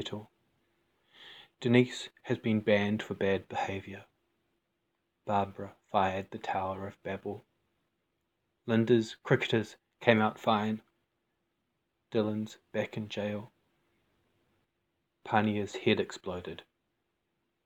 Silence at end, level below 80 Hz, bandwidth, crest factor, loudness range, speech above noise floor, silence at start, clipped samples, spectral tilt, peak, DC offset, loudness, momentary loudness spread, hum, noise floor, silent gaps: 1.05 s; -76 dBFS; 9 kHz; 26 dB; 8 LU; 50 dB; 0 s; under 0.1%; -6.5 dB/octave; -8 dBFS; under 0.1%; -32 LUFS; 18 LU; none; -81 dBFS; none